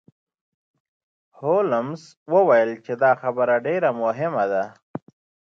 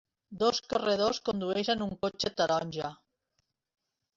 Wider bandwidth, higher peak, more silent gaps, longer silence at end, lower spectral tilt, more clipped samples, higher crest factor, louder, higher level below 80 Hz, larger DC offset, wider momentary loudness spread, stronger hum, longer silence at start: about the same, 7.2 kHz vs 7.8 kHz; first, -6 dBFS vs -12 dBFS; first, 2.17-2.26 s, 4.83-4.94 s vs none; second, 0.5 s vs 1.2 s; first, -7.5 dB/octave vs -4 dB/octave; neither; about the same, 18 dB vs 20 dB; first, -21 LUFS vs -31 LUFS; second, -76 dBFS vs -64 dBFS; neither; first, 16 LU vs 7 LU; neither; first, 1.4 s vs 0.3 s